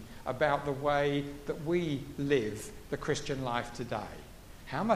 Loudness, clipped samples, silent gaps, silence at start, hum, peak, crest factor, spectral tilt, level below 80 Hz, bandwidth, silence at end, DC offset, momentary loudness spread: -33 LUFS; under 0.1%; none; 0 s; none; -14 dBFS; 20 dB; -5.5 dB/octave; -52 dBFS; 15.5 kHz; 0 s; under 0.1%; 12 LU